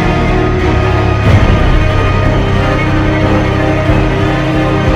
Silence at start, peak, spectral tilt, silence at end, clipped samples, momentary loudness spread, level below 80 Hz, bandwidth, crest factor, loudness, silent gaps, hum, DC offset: 0 s; 0 dBFS; -7.5 dB/octave; 0 s; 0.1%; 3 LU; -16 dBFS; 9 kHz; 10 dB; -11 LUFS; none; none; under 0.1%